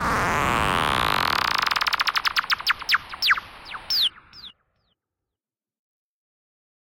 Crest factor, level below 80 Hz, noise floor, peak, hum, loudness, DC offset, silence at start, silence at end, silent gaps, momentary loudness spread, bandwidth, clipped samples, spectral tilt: 18 dB; -44 dBFS; under -90 dBFS; -8 dBFS; none; -22 LUFS; under 0.1%; 0 s; 2.35 s; none; 12 LU; 17 kHz; under 0.1%; -2.5 dB/octave